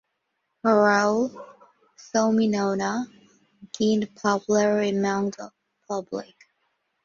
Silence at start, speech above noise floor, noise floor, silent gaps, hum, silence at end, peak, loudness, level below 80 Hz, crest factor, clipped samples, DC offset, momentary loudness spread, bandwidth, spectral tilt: 0.65 s; 54 dB; -77 dBFS; none; none; 0.8 s; -6 dBFS; -24 LUFS; -68 dBFS; 18 dB; under 0.1%; under 0.1%; 16 LU; 7.4 kHz; -5 dB/octave